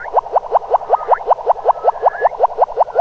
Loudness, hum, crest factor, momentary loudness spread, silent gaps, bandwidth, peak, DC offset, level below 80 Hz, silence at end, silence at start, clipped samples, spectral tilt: -16 LUFS; none; 14 dB; 2 LU; none; 6.6 kHz; -2 dBFS; under 0.1%; -50 dBFS; 0 s; 0 s; under 0.1%; -5 dB/octave